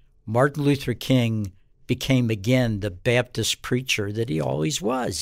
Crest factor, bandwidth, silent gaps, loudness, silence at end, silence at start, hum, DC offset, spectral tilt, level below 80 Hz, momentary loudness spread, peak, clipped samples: 16 dB; 16 kHz; none; -23 LUFS; 0 s; 0.25 s; none; under 0.1%; -5 dB/octave; -48 dBFS; 5 LU; -6 dBFS; under 0.1%